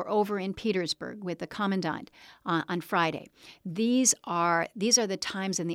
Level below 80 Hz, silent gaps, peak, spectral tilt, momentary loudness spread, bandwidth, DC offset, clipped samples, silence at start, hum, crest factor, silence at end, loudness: -68 dBFS; none; -10 dBFS; -3 dB/octave; 13 LU; 16.5 kHz; under 0.1%; under 0.1%; 0 s; none; 20 dB; 0 s; -28 LUFS